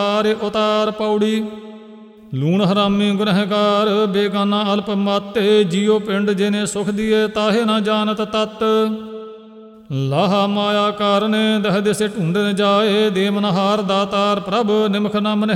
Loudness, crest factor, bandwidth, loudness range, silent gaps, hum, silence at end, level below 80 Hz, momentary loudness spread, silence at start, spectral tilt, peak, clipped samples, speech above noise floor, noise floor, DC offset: -17 LUFS; 14 dB; 13 kHz; 2 LU; none; none; 0 s; -56 dBFS; 5 LU; 0 s; -5.5 dB/octave; -4 dBFS; under 0.1%; 24 dB; -40 dBFS; under 0.1%